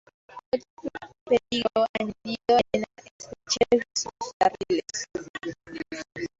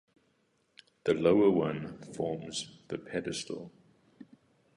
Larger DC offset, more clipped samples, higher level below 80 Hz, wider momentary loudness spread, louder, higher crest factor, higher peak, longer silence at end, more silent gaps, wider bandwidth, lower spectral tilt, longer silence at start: neither; neither; first, -58 dBFS vs -66 dBFS; about the same, 16 LU vs 17 LU; first, -27 LUFS vs -31 LUFS; about the same, 20 dB vs 22 dB; first, -8 dBFS vs -12 dBFS; second, 0.15 s vs 0.55 s; first, 0.46-0.52 s, 0.70-0.77 s, 1.21-1.26 s, 1.89-1.94 s, 3.11-3.19 s, 4.33-4.40 s, 5.29-5.34 s vs none; second, 8 kHz vs 11 kHz; second, -3 dB/octave vs -5.5 dB/octave; second, 0.35 s vs 1.05 s